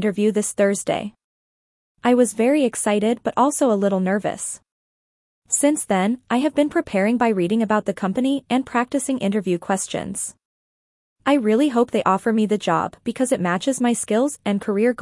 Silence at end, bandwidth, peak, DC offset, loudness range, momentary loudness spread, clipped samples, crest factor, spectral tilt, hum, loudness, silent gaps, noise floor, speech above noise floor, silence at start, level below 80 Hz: 0 s; 12 kHz; -4 dBFS; under 0.1%; 2 LU; 7 LU; under 0.1%; 16 dB; -4.5 dB/octave; none; -20 LUFS; 1.24-1.95 s, 4.72-5.42 s, 10.45-11.16 s; under -90 dBFS; over 70 dB; 0 s; -62 dBFS